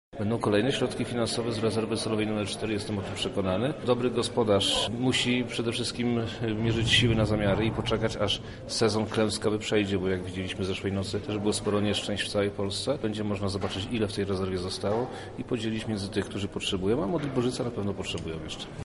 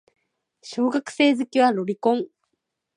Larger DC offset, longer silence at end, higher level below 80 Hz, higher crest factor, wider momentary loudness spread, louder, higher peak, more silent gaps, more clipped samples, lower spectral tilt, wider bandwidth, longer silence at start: neither; second, 0 s vs 0.7 s; first, -48 dBFS vs -78 dBFS; about the same, 20 dB vs 16 dB; about the same, 7 LU vs 9 LU; second, -28 LUFS vs -22 LUFS; about the same, -8 dBFS vs -6 dBFS; neither; neither; about the same, -5 dB/octave vs -5 dB/octave; about the same, 11.5 kHz vs 10.5 kHz; second, 0.15 s vs 0.65 s